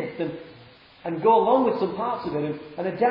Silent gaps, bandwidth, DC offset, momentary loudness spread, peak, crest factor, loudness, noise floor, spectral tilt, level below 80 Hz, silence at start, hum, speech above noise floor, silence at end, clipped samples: none; 5.4 kHz; under 0.1%; 14 LU; -6 dBFS; 18 dB; -24 LUFS; -50 dBFS; -10 dB/octave; -62 dBFS; 0 s; none; 27 dB; 0 s; under 0.1%